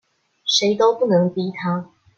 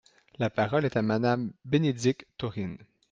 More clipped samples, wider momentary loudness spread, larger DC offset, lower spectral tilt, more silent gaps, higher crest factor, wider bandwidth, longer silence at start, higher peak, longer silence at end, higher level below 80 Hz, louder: neither; about the same, 10 LU vs 10 LU; neither; second, -4.5 dB/octave vs -6.5 dB/octave; neither; about the same, 16 dB vs 18 dB; second, 7.8 kHz vs 9.4 kHz; about the same, 0.45 s vs 0.4 s; first, -4 dBFS vs -12 dBFS; about the same, 0.35 s vs 0.3 s; second, -68 dBFS vs -62 dBFS; first, -19 LUFS vs -29 LUFS